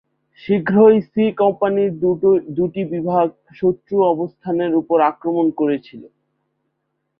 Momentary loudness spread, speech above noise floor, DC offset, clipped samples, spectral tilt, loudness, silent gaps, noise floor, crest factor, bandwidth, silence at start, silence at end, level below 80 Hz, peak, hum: 10 LU; 56 dB; under 0.1%; under 0.1%; -11.5 dB/octave; -18 LUFS; none; -73 dBFS; 16 dB; 5.2 kHz; 0.45 s; 1.15 s; -60 dBFS; -2 dBFS; none